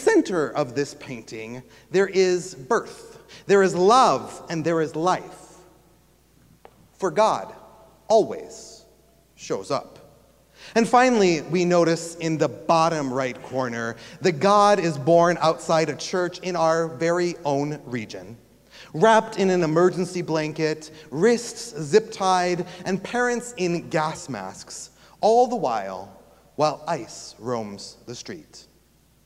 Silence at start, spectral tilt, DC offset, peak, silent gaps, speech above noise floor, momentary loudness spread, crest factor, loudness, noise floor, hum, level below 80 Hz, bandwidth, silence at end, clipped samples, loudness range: 0 s; -5 dB/octave; under 0.1%; -4 dBFS; none; 37 dB; 18 LU; 20 dB; -22 LUFS; -59 dBFS; none; -62 dBFS; 15 kHz; 0.65 s; under 0.1%; 5 LU